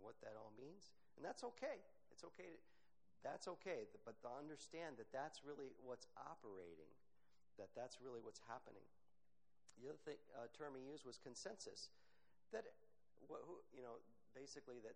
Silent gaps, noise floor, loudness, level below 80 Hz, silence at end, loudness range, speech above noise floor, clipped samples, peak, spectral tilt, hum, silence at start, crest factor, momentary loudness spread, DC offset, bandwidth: none; -88 dBFS; -57 LUFS; under -90 dBFS; 0 s; 5 LU; 32 dB; under 0.1%; -36 dBFS; -3.5 dB/octave; 60 Hz at -90 dBFS; 0 s; 20 dB; 10 LU; under 0.1%; 10 kHz